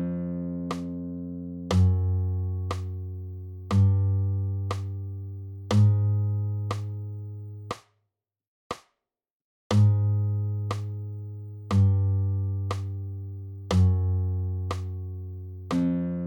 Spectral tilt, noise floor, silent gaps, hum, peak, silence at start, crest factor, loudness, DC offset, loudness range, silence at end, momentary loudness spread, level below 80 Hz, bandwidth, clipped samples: -8 dB/octave; -82 dBFS; 8.48-8.70 s, 9.31-9.70 s; none; -12 dBFS; 0 s; 16 dB; -27 LUFS; under 0.1%; 3 LU; 0 s; 17 LU; -50 dBFS; 8.4 kHz; under 0.1%